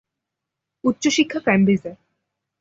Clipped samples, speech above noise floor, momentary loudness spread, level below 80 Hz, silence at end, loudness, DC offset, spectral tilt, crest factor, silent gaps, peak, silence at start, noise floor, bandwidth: under 0.1%; 64 dB; 7 LU; -60 dBFS; 0.65 s; -19 LUFS; under 0.1%; -5 dB/octave; 18 dB; none; -4 dBFS; 0.85 s; -83 dBFS; 7.8 kHz